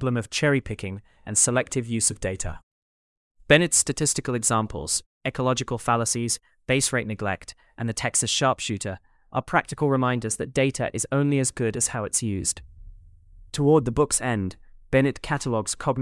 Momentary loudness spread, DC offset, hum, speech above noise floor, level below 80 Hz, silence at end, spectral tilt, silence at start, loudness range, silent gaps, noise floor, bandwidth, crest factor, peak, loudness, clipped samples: 12 LU; under 0.1%; none; 25 dB; -48 dBFS; 0 s; -4 dB/octave; 0 s; 3 LU; 2.63-3.35 s, 5.06-5.21 s; -49 dBFS; 12 kHz; 22 dB; -4 dBFS; -24 LUFS; under 0.1%